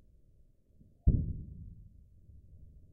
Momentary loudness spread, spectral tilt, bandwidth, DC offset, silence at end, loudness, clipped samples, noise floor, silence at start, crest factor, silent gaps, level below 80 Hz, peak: 27 LU; -17.5 dB/octave; 0.8 kHz; under 0.1%; 0.25 s; -35 LUFS; under 0.1%; -63 dBFS; 1.05 s; 22 dB; none; -40 dBFS; -16 dBFS